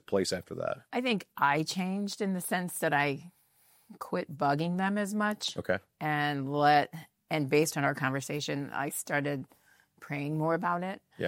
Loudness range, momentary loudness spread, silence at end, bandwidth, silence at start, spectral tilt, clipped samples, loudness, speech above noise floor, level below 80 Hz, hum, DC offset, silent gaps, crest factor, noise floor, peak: 3 LU; 9 LU; 0 s; 16.5 kHz; 0.1 s; -4.5 dB/octave; under 0.1%; -31 LUFS; 35 dB; -76 dBFS; none; under 0.1%; none; 22 dB; -66 dBFS; -10 dBFS